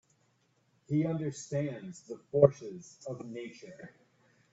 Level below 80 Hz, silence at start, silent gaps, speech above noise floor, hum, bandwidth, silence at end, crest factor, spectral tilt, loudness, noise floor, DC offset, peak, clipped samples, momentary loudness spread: -70 dBFS; 0.9 s; none; 40 dB; none; 8.2 kHz; 0.65 s; 28 dB; -7.5 dB/octave; -31 LUFS; -72 dBFS; under 0.1%; -6 dBFS; under 0.1%; 23 LU